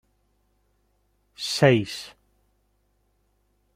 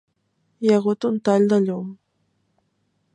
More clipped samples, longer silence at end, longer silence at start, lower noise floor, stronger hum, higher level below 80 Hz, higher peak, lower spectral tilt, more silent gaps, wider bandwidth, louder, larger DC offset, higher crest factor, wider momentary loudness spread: neither; first, 1.65 s vs 1.2 s; first, 1.4 s vs 0.6 s; about the same, -69 dBFS vs -70 dBFS; first, 50 Hz at -60 dBFS vs none; first, -64 dBFS vs -72 dBFS; about the same, -4 dBFS vs -6 dBFS; second, -5 dB/octave vs -7.5 dB/octave; neither; first, 15.5 kHz vs 9.8 kHz; about the same, -22 LUFS vs -20 LUFS; neither; first, 26 dB vs 18 dB; first, 18 LU vs 11 LU